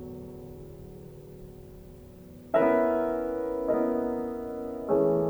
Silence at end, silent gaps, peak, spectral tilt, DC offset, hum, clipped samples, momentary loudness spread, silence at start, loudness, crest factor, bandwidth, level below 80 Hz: 0 s; none; -12 dBFS; -8.5 dB/octave; under 0.1%; none; under 0.1%; 24 LU; 0 s; -28 LUFS; 18 dB; over 20 kHz; -54 dBFS